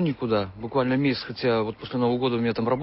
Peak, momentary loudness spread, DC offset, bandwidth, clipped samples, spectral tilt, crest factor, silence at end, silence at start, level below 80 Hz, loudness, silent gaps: -12 dBFS; 3 LU; under 0.1%; 5.8 kHz; under 0.1%; -11 dB/octave; 12 dB; 0 s; 0 s; -54 dBFS; -25 LUFS; none